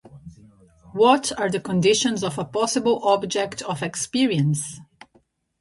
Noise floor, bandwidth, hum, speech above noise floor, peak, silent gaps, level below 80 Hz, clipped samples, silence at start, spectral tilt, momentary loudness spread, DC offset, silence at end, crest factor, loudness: -62 dBFS; 11.5 kHz; none; 41 dB; -2 dBFS; none; -58 dBFS; under 0.1%; 0.15 s; -4.5 dB/octave; 10 LU; under 0.1%; 0.8 s; 20 dB; -22 LUFS